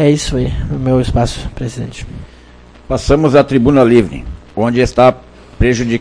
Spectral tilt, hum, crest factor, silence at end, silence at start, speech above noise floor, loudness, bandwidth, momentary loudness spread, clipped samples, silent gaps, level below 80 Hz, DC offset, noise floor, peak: -6.5 dB/octave; none; 14 dB; 0 s; 0 s; 27 dB; -13 LUFS; 10.5 kHz; 16 LU; 0.3%; none; -26 dBFS; under 0.1%; -39 dBFS; 0 dBFS